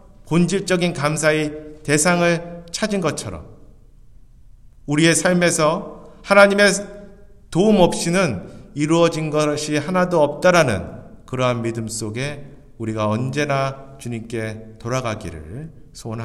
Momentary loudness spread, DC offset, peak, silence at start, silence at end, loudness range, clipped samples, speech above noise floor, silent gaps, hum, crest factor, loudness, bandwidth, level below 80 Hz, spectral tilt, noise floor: 19 LU; under 0.1%; 0 dBFS; 0.25 s; 0 s; 8 LU; under 0.1%; 26 dB; none; none; 20 dB; -19 LUFS; 14 kHz; -46 dBFS; -4.5 dB/octave; -45 dBFS